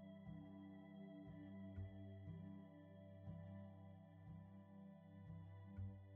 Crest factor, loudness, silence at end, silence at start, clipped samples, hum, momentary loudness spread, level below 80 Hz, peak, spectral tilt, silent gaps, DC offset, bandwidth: 16 dB; -59 LUFS; 0 s; 0 s; under 0.1%; none; 7 LU; -74 dBFS; -42 dBFS; -8.5 dB/octave; none; under 0.1%; 3.7 kHz